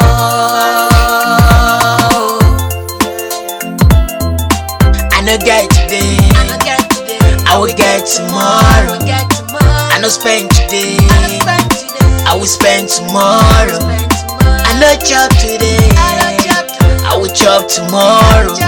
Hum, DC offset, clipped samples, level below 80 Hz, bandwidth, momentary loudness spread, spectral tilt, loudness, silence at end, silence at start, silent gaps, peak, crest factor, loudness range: none; under 0.1%; 0.2%; -14 dBFS; 18 kHz; 6 LU; -4 dB/octave; -9 LUFS; 0 s; 0 s; none; 0 dBFS; 8 dB; 2 LU